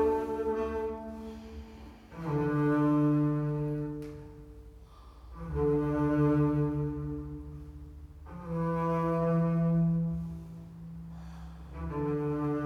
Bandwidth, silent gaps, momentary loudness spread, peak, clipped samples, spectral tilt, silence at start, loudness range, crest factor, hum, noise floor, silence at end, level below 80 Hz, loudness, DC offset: 6.6 kHz; none; 21 LU; -16 dBFS; under 0.1%; -10 dB/octave; 0 s; 1 LU; 16 dB; none; -51 dBFS; 0 s; -48 dBFS; -30 LUFS; under 0.1%